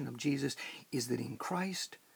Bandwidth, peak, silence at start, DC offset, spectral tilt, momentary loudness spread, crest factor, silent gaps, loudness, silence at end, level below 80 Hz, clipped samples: over 20 kHz; -22 dBFS; 0 s; under 0.1%; -4.5 dB/octave; 5 LU; 16 dB; none; -37 LUFS; 0.2 s; -78 dBFS; under 0.1%